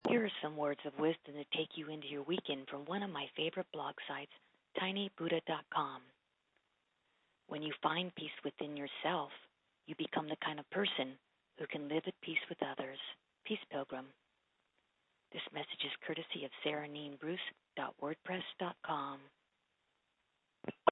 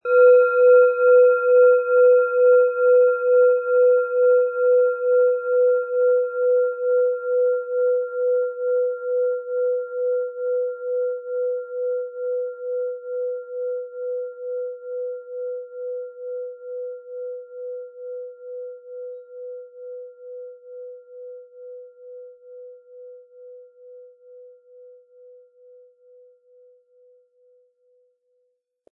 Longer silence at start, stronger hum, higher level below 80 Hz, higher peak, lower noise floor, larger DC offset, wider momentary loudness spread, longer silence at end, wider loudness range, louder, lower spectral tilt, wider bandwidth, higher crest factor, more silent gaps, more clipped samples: about the same, 0.05 s vs 0.05 s; neither; about the same, -90 dBFS vs under -90 dBFS; second, -14 dBFS vs -6 dBFS; first, -83 dBFS vs -71 dBFS; neither; second, 10 LU vs 23 LU; second, 0 s vs 4.45 s; second, 4 LU vs 23 LU; second, -41 LUFS vs -20 LUFS; second, -1.5 dB/octave vs -6 dB/octave; first, 3.9 kHz vs 2.7 kHz; first, 28 dB vs 16 dB; neither; neither